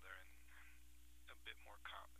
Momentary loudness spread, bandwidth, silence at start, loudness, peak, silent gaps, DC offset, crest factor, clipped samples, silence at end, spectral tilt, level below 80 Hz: 11 LU; 15.5 kHz; 0 s; -60 LUFS; -38 dBFS; none; under 0.1%; 22 dB; under 0.1%; 0 s; -2 dB/octave; -68 dBFS